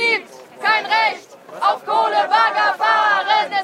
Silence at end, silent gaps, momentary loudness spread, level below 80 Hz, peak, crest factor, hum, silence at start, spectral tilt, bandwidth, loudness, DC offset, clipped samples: 0 s; none; 6 LU; -82 dBFS; -2 dBFS; 14 dB; none; 0 s; -1.5 dB/octave; 13.5 kHz; -17 LUFS; under 0.1%; under 0.1%